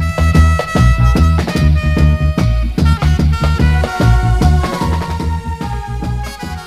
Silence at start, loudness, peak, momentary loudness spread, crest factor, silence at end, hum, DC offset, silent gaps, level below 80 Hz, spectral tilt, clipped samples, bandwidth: 0 s; -14 LUFS; 0 dBFS; 10 LU; 12 dB; 0 s; none; under 0.1%; none; -16 dBFS; -7 dB/octave; under 0.1%; 13 kHz